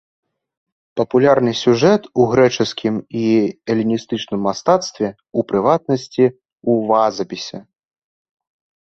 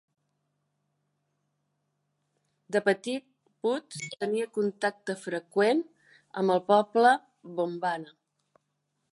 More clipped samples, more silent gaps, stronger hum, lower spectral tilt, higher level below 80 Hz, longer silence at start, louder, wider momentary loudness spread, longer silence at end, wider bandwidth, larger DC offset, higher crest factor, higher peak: neither; first, 6.52-6.56 s vs none; neither; about the same, -6 dB/octave vs -5 dB/octave; first, -56 dBFS vs -86 dBFS; second, 0.95 s vs 2.7 s; first, -17 LUFS vs -28 LUFS; second, 11 LU vs 14 LU; about the same, 1.2 s vs 1.1 s; second, 7.8 kHz vs 11.5 kHz; neither; second, 16 dB vs 22 dB; first, -2 dBFS vs -8 dBFS